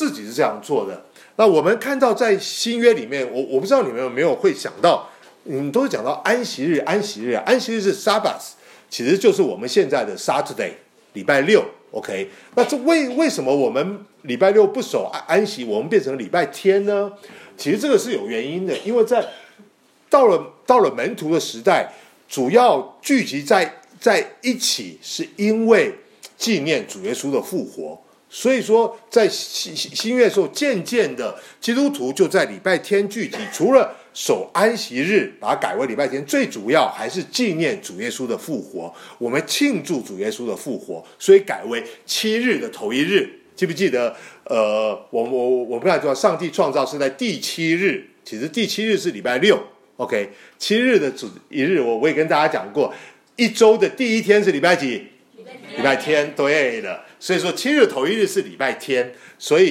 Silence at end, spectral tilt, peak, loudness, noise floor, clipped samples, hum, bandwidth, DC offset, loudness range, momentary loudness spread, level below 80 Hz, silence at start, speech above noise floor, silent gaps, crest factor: 0 s; -4 dB/octave; -2 dBFS; -19 LUFS; -54 dBFS; under 0.1%; none; 16 kHz; under 0.1%; 3 LU; 12 LU; -74 dBFS; 0 s; 35 dB; none; 18 dB